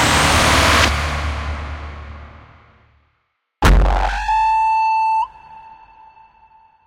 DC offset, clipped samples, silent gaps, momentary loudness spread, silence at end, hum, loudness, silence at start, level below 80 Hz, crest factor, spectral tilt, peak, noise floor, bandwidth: under 0.1%; under 0.1%; none; 19 LU; 1.15 s; none; -16 LUFS; 0 s; -24 dBFS; 16 dB; -3.5 dB/octave; -2 dBFS; -69 dBFS; 16.5 kHz